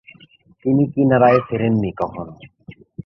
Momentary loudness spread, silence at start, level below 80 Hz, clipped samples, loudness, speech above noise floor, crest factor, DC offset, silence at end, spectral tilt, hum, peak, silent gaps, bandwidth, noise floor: 19 LU; 0.65 s; -50 dBFS; under 0.1%; -17 LUFS; 33 dB; 16 dB; under 0.1%; 0.05 s; -10.5 dB/octave; none; -2 dBFS; none; 5.8 kHz; -50 dBFS